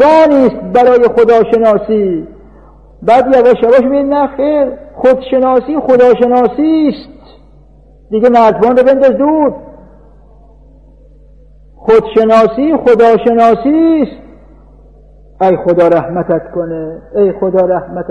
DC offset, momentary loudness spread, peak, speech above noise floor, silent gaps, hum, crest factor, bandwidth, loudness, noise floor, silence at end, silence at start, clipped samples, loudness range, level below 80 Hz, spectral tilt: under 0.1%; 9 LU; 0 dBFS; 31 dB; none; none; 10 dB; 7.6 kHz; -9 LUFS; -40 dBFS; 0 s; 0 s; under 0.1%; 4 LU; -40 dBFS; -7.5 dB/octave